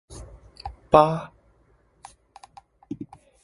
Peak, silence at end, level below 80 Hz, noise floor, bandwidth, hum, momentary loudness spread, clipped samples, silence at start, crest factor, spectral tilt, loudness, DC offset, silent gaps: 0 dBFS; 0.4 s; -50 dBFS; -62 dBFS; 11.5 kHz; none; 26 LU; under 0.1%; 0.1 s; 26 dB; -7 dB/octave; -20 LUFS; under 0.1%; none